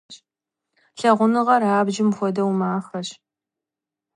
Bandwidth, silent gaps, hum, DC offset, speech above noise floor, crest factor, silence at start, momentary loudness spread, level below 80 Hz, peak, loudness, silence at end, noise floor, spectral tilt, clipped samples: 11 kHz; none; none; under 0.1%; 68 dB; 18 dB; 0.1 s; 13 LU; -72 dBFS; -4 dBFS; -20 LUFS; 1.05 s; -87 dBFS; -6 dB/octave; under 0.1%